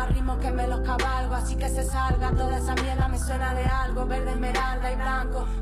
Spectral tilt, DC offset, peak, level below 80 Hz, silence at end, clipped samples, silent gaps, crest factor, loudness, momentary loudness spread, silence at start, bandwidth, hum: -5.5 dB/octave; under 0.1%; -12 dBFS; -26 dBFS; 0 s; under 0.1%; none; 12 dB; -27 LUFS; 3 LU; 0 s; 14.5 kHz; none